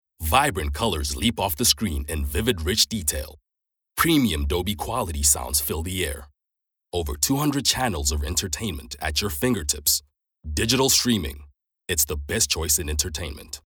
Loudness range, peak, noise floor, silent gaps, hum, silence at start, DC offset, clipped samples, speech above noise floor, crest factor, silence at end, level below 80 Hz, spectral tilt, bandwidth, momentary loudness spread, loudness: 2 LU; -2 dBFS; -82 dBFS; none; none; 0.2 s; under 0.1%; under 0.1%; 58 dB; 22 dB; 0.1 s; -36 dBFS; -3 dB/octave; over 20 kHz; 11 LU; -23 LUFS